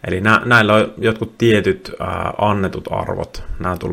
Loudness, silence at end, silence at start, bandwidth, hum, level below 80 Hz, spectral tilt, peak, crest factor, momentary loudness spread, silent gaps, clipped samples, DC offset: -17 LUFS; 0 s; 0.05 s; 16.5 kHz; none; -38 dBFS; -6 dB/octave; 0 dBFS; 16 dB; 13 LU; none; under 0.1%; under 0.1%